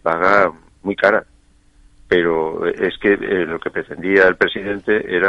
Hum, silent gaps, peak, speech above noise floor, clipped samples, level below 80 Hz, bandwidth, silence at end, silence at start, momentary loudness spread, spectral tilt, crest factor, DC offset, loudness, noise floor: none; none; 0 dBFS; 35 dB; under 0.1%; -48 dBFS; 7.8 kHz; 0 s; 0.05 s; 11 LU; -6.5 dB/octave; 18 dB; under 0.1%; -17 LUFS; -51 dBFS